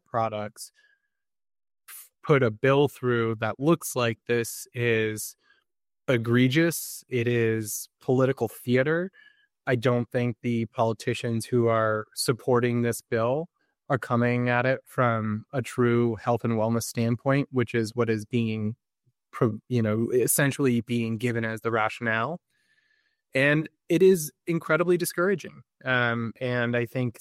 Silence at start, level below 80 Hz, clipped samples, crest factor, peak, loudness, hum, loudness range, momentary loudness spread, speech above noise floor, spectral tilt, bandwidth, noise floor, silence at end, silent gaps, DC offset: 0.15 s; -66 dBFS; under 0.1%; 18 dB; -8 dBFS; -26 LUFS; none; 2 LU; 10 LU; 57 dB; -5.5 dB/octave; 16 kHz; -82 dBFS; 0.1 s; none; under 0.1%